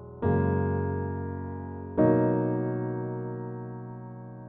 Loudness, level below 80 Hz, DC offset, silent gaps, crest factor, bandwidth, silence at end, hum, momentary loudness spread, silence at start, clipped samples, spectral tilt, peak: -29 LUFS; -54 dBFS; under 0.1%; none; 18 dB; 3.6 kHz; 0 s; none; 16 LU; 0 s; under 0.1%; -13.5 dB/octave; -10 dBFS